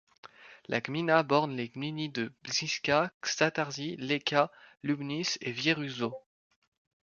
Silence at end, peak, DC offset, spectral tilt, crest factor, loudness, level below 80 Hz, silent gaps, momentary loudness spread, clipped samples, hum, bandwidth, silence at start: 0.95 s; -10 dBFS; under 0.1%; -4 dB/octave; 22 dB; -31 LUFS; -72 dBFS; 3.14-3.21 s; 9 LU; under 0.1%; none; 7.2 kHz; 0.25 s